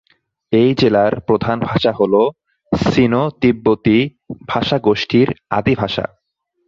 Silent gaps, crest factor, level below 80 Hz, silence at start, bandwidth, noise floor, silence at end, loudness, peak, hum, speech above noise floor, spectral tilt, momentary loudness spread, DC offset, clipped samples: none; 14 dB; -44 dBFS; 0.5 s; 7.6 kHz; -46 dBFS; 0.6 s; -16 LUFS; -2 dBFS; none; 31 dB; -7.5 dB/octave; 8 LU; under 0.1%; under 0.1%